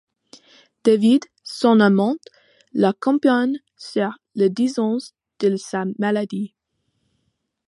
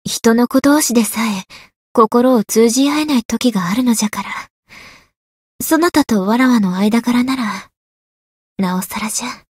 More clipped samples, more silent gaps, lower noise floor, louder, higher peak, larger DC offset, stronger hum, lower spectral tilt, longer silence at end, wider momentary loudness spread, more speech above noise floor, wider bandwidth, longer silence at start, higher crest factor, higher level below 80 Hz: neither; second, none vs 1.76-1.95 s, 3.25-3.29 s, 4.50-4.63 s, 5.17-5.59 s, 7.77-8.56 s; first, -72 dBFS vs -41 dBFS; second, -20 LUFS vs -15 LUFS; about the same, -2 dBFS vs 0 dBFS; neither; neither; first, -6.5 dB/octave vs -4 dB/octave; first, 1.25 s vs 0.2 s; first, 14 LU vs 10 LU; first, 54 dB vs 27 dB; second, 11.5 kHz vs 16.5 kHz; first, 0.85 s vs 0.05 s; about the same, 18 dB vs 16 dB; second, -72 dBFS vs -52 dBFS